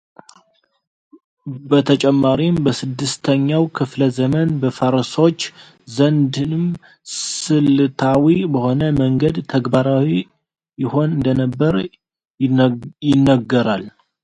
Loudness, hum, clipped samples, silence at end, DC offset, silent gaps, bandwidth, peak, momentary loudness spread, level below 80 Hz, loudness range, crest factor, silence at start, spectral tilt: -17 LUFS; none; under 0.1%; 0.35 s; under 0.1%; 12.30-12.34 s; 9.4 kHz; 0 dBFS; 10 LU; -48 dBFS; 2 LU; 16 dB; 1.45 s; -6.5 dB/octave